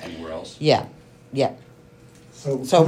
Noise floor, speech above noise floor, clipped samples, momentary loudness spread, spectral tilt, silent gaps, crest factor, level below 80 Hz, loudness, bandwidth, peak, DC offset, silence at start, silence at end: -49 dBFS; 28 dB; under 0.1%; 15 LU; -6 dB/octave; none; 22 dB; -60 dBFS; -24 LUFS; 15 kHz; -2 dBFS; under 0.1%; 0 s; 0 s